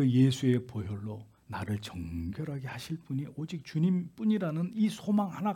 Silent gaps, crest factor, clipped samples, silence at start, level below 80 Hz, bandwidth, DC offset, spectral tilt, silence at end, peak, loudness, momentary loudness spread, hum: none; 18 dB; under 0.1%; 0 s; -62 dBFS; 16 kHz; under 0.1%; -7.5 dB/octave; 0 s; -14 dBFS; -32 LUFS; 12 LU; none